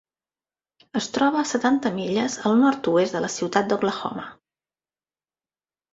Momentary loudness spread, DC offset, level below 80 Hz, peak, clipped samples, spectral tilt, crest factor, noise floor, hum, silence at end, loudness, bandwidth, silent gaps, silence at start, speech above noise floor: 11 LU; under 0.1%; -66 dBFS; -4 dBFS; under 0.1%; -4.5 dB/octave; 22 dB; under -90 dBFS; none; 1.6 s; -23 LUFS; 8 kHz; none; 0.95 s; over 68 dB